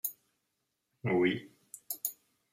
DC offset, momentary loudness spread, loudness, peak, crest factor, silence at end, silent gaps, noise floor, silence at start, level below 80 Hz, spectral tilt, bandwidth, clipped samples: under 0.1%; 18 LU; -34 LUFS; -12 dBFS; 24 dB; 0.4 s; none; -83 dBFS; 0.05 s; -78 dBFS; -4.5 dB/octave; 16 kHz; under 0.1%